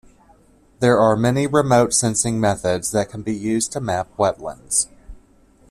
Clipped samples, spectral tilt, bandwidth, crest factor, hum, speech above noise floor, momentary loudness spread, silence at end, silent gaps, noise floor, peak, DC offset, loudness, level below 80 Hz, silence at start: under 0.1%; -4.5 dB/octave; 14.5 kHz; 18 dB; none; 34 dB; 9 LU; 0.55 s; none; -53 dBFS; -2 dBFS; under 0.1%; -19 LUFS; -48 dBFS; 0.8 s